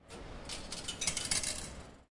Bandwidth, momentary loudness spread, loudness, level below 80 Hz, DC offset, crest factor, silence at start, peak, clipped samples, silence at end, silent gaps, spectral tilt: 11.5 kHz; 15 LU; -36 LUFS; -52 dBFS; under 0.1%; 22 dB; 0.05 s; -18 dBFS; under 0.1%; 0.05 s; none; -1 dB/octave